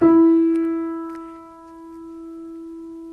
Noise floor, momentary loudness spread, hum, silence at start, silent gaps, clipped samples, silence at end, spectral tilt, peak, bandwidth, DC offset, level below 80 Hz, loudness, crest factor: -41 dBFS; 26 LU; none; 0 s; none; under 0.1%; 0 s; -9 dB/octave; -6 dBFS; 2.8 kHz; under 0.1%; -60 dBFS; -18 LUFS; 14 dB